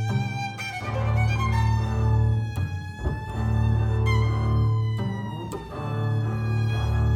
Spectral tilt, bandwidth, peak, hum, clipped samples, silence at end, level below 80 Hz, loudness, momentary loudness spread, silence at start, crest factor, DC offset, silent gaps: -7 dB/octave; 9.2 kHz; -12 dBFS; none; under 0.1%; 0 s; -32 dBFS; -25 LUFS; 8 LU; 0 s; 12 dB; under 0.1%; none